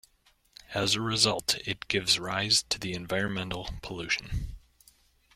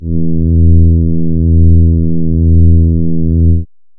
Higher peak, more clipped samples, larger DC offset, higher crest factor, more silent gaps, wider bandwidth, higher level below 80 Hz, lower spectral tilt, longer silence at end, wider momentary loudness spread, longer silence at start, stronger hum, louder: second, -8 dBFS vs 0 dBFS; neither; neither; first, 24 dB vs 6 dB; neither; first, 16.5 kHz vs 0.7 kHz; second, -48 dBFS vs -18 dBFS; second, -2.5 dB/octave vs -20 dB/octave; first, 0.8 s vs 0.35 s; first, 13 LU vs 5 LU; first, 0.7 s vs 0 s; neither; second, -28 LUFS vs -10 LUFS